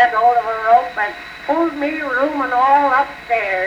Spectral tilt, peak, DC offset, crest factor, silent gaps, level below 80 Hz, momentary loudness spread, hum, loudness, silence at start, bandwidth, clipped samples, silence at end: -4.5 dB/octave; -2 dBFS; under 0.1%; 14 dB; none; -52 dBFS; 8 LU; none; -16 LUFS; 0 s; 9.4 kHz; under 0.1%; 0 s